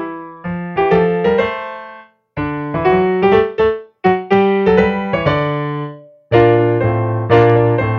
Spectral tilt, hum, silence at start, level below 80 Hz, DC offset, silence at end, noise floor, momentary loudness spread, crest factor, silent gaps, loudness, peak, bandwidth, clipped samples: -9 dB/octave; none; 0 s; -40 dBFS; under 0.1%; 0 s; -39 dBFS; 14 LU; 14 dB; none; -15 LUFS; 0 dBFS; 6.2 kHz; under 0.1%